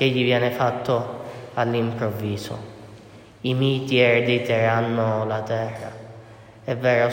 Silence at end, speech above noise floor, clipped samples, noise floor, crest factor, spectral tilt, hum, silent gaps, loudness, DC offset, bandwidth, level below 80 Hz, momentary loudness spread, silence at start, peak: 0 s; 23 dB; under 0.1%; -45 dBFS; 18 dB; -6.5 dB/octave; none; none; -22 LUFS; under 0.1%; 16.5 kHz; -62 dBFS; 17 LU; 0 s; -4 dBFS